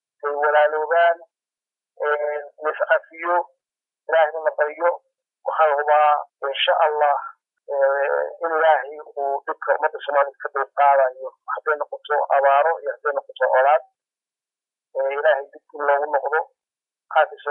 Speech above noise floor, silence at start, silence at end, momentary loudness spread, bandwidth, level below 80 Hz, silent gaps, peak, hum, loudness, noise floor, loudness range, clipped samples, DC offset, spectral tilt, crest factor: over 70 dB; 0.25 s; 0 s; 11 LU; 4 kHz; under -90 dBFS; none; -4 dBFS; none; -21 LUFS; under -90 dBFS; 3 LU; under 0.1%; under 0.1%; -2.5 dB/octave; 16 dB